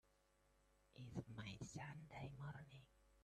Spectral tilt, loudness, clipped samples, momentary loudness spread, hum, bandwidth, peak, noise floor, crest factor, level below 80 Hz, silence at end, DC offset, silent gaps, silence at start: -5.5 dB/octave; -55 LUFS; under 0.1%; 10 LU; 50 Hz at -70 dBFS; 13 kHz; -36 dBFS; -79 dBFS; 20 dB; -74 dBFS; 0 s; under 0.1%; none; 0.05 s